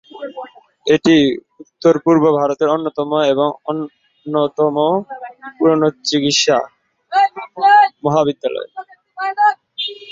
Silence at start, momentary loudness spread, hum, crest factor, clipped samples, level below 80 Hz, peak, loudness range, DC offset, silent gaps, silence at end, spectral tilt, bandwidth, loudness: 0.15 s; 19 LU; none; 14 dB; under 0.1%; -60 dBFS; -2 dBFS; 3 LU; under 0.1%; none; 0 s; -4.5 dB/octave; 7.8 kHz; -16 LUFS